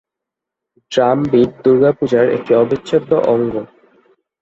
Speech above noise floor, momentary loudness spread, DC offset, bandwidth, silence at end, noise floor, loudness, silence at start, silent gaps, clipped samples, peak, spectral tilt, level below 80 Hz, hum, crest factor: 69 dB; 5 LU; under 0.1%; 8 kHz; 0.75 s; -83 dBFS; -14 LUFS; 0.9 s; none; under 0.1%; 0 dBFS; -7.5 dB/octave; -52 dBFS; none; 14 dB